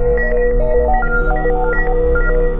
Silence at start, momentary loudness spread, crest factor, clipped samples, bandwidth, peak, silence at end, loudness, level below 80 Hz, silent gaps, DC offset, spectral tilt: 0 s; 2 LU; 10 dB; under 0.1%; 2.9 kHz; -2 dBFS; 0 s; -16 LUFS; -16 dBFS; none; under 0.1%; -11 dB/octave